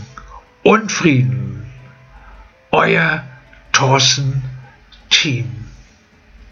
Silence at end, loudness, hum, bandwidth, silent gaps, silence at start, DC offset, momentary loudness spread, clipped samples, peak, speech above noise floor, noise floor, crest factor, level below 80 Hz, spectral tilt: 0.1 s; -14 LUFS; none; 7.6 kHz; none; 0 s; under 0.1%; 20 LU; under 0.1%; 0 dBFS; 33 dB; -48 dBFS; 18 dB; -44 dBFS; -4 dB/octave